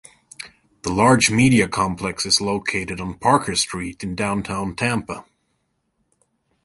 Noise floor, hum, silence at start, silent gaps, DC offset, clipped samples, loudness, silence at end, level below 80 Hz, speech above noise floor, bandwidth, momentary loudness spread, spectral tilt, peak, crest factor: -71 dBFS; none; 0.4 s; none; under 0.1%; under 0.1%; -20 LUFS; 1.45 s; -46 dBFS; 51 dB; 11.5 kHz; 19 LU; -4 dB/octave; -2 dBFS; 20 dB